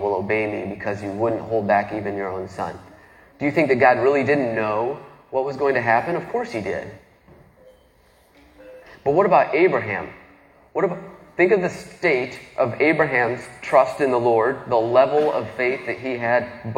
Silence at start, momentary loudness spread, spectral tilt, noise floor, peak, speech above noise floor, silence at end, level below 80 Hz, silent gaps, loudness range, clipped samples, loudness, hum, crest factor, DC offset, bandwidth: 0 s; 12 LU; -7 dB/octave; -56 dBFS; -2 dBFS; 35 dB; 0 s; -58 dBFS; none; 6 LU; under 0.1%; -21 LUFS; none; 20 dB; under 0.1%; 11 kHz